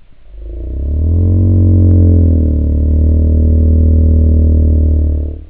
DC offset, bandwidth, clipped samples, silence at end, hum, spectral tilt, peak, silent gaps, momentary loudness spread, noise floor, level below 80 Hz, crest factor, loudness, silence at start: under 0.1%; 1.1 kHz; under 0.1%; 0.05 s; none; -15 dB/octave; 0 dBFS; none; 8 LU; -29 dBFS; -12 dBFS; 10 dB; -11 LUFS; 0.35 s